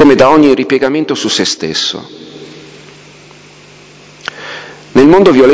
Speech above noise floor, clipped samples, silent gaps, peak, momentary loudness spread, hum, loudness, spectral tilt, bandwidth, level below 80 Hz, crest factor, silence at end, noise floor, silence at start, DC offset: 29 dB; 3%; none; 0 dBFS; 25 LU; 50 Hz at -45 dBFS; -9 LUFS; -4.5 dB/octave; 8 kHz; -44 dBFS; 10 dB; 0 s; -37 dBFS; 0 s; under 0.1%